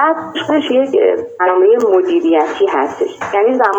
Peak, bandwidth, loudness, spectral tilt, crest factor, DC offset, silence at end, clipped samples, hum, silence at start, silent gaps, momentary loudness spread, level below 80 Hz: 0 dBFS; 8 kHz; -13 LUFS; -5 dB/octave; 12 dB; under 0.1%; 0 s; under 0.1%; none; 0 s; none; 6 LU; -60 dBFS